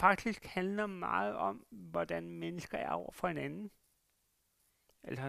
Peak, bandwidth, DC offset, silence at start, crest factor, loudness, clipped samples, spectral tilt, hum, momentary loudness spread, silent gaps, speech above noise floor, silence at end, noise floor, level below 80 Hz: -12 dBFS; 15 kHz; under 0.1%; 0 s; 26 dB; -38 LUFS; under 0.1%; -6 dB/octave; none; 11 LU; none; 41 dB; 0 s; -78 dBFS; -66 dBFS